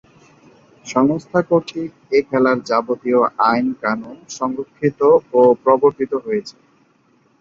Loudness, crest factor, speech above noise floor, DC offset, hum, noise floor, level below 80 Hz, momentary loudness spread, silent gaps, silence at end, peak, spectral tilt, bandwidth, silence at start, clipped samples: -17 LUFS; 16 dB; 40 dB; under 0.1%; none; -57 dBFS; -60 dBFS; 12 LU; none; 0.9 s; -2 dBFS; -6 dB/octave; 7.6 kHz; 0.85 s; under 0.1%